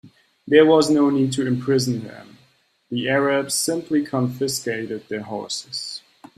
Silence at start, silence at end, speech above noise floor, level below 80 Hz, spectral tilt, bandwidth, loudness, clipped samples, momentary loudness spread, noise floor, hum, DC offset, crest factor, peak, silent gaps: 0.05 s; 0.4 s; 40 dB; -62 dBFS; -4.5 dB/octave; 15 kHz; -21 LUFS; under 0.1%; 14 LU; -60 dBFS; none; under 0.1%; 20 dB; -2 dBFS; none